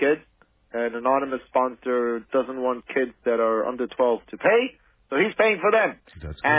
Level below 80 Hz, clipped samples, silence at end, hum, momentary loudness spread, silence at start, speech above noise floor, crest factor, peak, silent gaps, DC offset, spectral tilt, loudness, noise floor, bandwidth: -52 dBFS; under 0.1%; 0 s; none; 8 LU; 0 s; 37 dB; 18 dB; -6 dBFS; none; under 0.1%; -9 dB/octave; -24 LUFS; -60 dBFS; 4 kHz